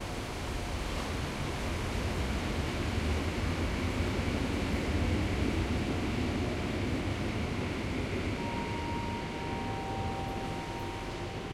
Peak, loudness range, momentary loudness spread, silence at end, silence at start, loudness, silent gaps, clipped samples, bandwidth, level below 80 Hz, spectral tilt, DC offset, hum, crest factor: -16 dBFS; 3 LU; 5 LU; 0 s; 0 s; -34 LUFS; none; under 0.1%; 15 kHz; -40 dBFS; -5.5 dB/octave; under 0.1%; none; 16 dB